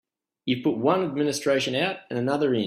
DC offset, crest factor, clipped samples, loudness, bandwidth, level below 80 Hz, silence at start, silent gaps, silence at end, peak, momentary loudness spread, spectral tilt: under 0.1%; 18 dB; under 0.1%; -25 LUFS; 15 kHz; -66 dBFS; 0.45 s; none; 0 s; -8 dBFS; 6 LU; -5 dB/octave